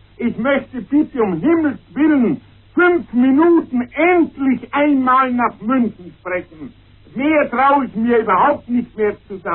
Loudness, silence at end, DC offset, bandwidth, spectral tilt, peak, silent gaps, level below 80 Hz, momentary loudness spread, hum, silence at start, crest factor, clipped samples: -16 LUFS; 0 s; under 0.1%; 4.2 kHz; -10.5 dB/octave; -4 dBFS; none; -50 dBFS; 11 LU; none; 0.2 s; 12 dB; under 0.1%